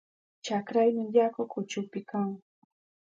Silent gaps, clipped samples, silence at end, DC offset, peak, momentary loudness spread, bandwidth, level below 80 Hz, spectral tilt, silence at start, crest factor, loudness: none; under 0.1%; 0.7 s; under 0.1%; -12 dBFS; 10 LU; 7.8 kHz; -82 dBFS; -6 dB/octave; 0.45 s; 20 dB; -29 LUFS